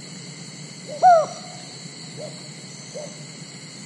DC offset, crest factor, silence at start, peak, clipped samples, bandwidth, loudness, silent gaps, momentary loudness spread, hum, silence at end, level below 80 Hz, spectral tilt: under 0.1%; 20 dB; 0 s; -4 dBFS; under 0.1%; 11.5 kHz; -17 LUFS; none; 21 LU; none; 0 s; -80 dBFS; -3.5 dB/octave